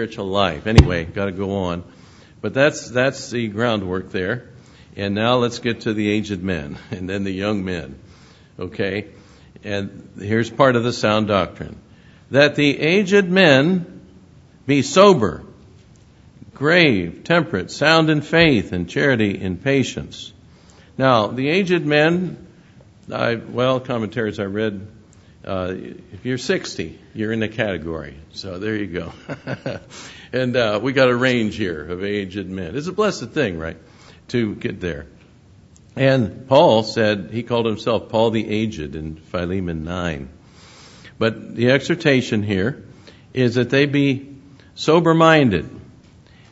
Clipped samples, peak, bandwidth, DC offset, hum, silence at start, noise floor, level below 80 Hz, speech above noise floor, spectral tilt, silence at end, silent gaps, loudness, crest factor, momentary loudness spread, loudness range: under 0.1%; 0 dBFS; 8.4 kHz; under 0.1%; none; 0 s; -48 dBFS; -40 dBFS; 29 dB; -6 dB/octave; 0.65 s; none; -19 LUFS; 20 dB; 17 LU; 9 LU